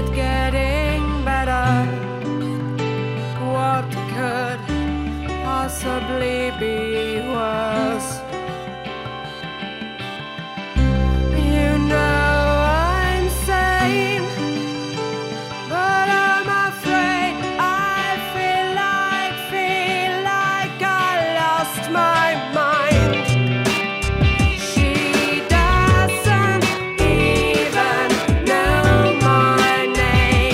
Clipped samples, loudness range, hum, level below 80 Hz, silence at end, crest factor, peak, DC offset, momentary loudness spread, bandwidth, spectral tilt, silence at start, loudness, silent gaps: under 0.1%; 6 LU; none; -28 dBFS; 0 s; 14 dB; -4 dBFS; under 0.1%; 10 LU; 16 kHz; -5 dB/octave; 0 s; -19 LUFS; none